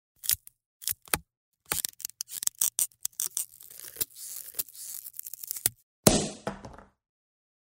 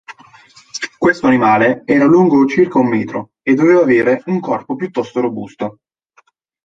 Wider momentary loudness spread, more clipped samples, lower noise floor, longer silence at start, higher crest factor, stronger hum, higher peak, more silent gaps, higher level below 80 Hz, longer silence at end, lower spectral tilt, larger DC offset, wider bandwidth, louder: about the same, 14 LU vs 15 LU; neither; second, -49 dBFS vs -55 dBFS; first, 0.25 s vs 0.1 s; first, 32 dB vs 14 dB; neither; about the same, 0 dBFS vs -2 dBFS; first, 0.66-0.80 s, 1.37-1.52 s, 5.83-6.03 s vs none; about the same, -54 dBFS vs -56 dBFS; second, 0.8 s vs 0.95 s; second, -2.5 dB/octave vs -6.5 dB/octave; neither; first, 16.5 kHz vs 7.8 kHz; second, -30 LUFS vs -14 LUFS